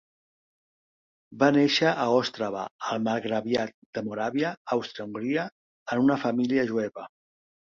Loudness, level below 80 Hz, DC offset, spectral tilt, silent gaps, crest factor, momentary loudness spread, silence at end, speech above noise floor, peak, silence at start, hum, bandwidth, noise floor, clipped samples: -27 LUFS; -70 dBFS; under 0.1%; -5.5 dB/octave; 2.71-2.79 s, 3.74-3.93 s, 4.57-4.65 s, 5.52-5.86 s; 20 dB; 13 LU; 0.65 s; over 64 dB; -8 dBFS; 1.3 s; none; 7.4 kHz; under -90 dBFS; under 0.1%